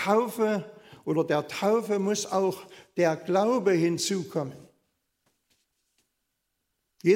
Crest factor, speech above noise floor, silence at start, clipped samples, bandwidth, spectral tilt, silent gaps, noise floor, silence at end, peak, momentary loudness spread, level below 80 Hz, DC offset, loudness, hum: 18 dB; 54 dB; 0 s; under 0.1%; 16 kHz; -5 dB/octave; none; -80 dBFS; 0 s; -10 dBFS; 11 LU; -76 dBFS; under 0.1%; -27 LUFS; none